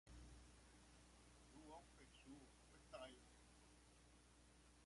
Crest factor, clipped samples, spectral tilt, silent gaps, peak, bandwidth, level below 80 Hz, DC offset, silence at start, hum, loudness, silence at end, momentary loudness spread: 22 dB; under 0.1%; -4 dB/octave; none; -44 dBFS; 11.5 kHz; -72 dBFS; under 0.1%; 0.05 s; 60 Hz at -75 dBFS; -65 LUFS; 0 s; 9 LU